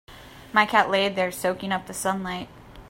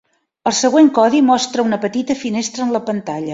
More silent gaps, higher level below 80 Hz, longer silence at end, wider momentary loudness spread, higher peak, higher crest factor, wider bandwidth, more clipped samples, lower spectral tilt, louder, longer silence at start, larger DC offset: neither; first, -54 dBFS vs -60 dBFS; about the same, 0 s vs 0 s; about the same, 12 LU vs 10 LU; about the same, -4 dBFS vs -2 dBFS; first, 22 dB vs 14 dB; first, 16 kHz vs 7.8 kHz; neither; about the same, -3.5 dB/octave vs -4 dB/octave; second, -24 LUFS vs -16 LUFS; second, 0.1 s vs 0.45 s; neither